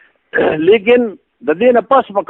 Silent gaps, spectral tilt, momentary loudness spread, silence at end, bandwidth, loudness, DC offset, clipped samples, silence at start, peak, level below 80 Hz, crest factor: none; -8 dB/octave; 11 LU; 0.05 s; 4 kHz; -13 LUFS; under 0.1%; under 0.1%; 0.35 s; 0 dBFS; -52 dBFS; 12 dB